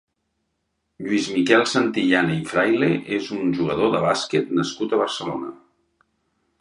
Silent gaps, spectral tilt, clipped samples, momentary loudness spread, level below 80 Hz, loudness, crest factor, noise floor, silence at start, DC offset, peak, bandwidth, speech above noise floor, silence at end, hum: none; -5 dB/octave; under 0.1%; 9 LU; -60 dBFS; -21 LUFS; 20 dB; -74 dBFS; 1 s; under 0.1%; -2 dBFS; 11 kHz; 54 dB; 1.05 s; none